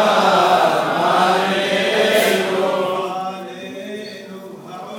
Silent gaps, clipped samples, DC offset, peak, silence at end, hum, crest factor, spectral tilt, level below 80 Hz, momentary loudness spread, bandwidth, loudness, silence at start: none; under 0.1%; under 0.1%; -2 dBFS; 0 s; none; 16 dB; -3.5 dB/octave; -72 dBFS; 19 LU; 19.5 kHz; -16 LUFS; 0 s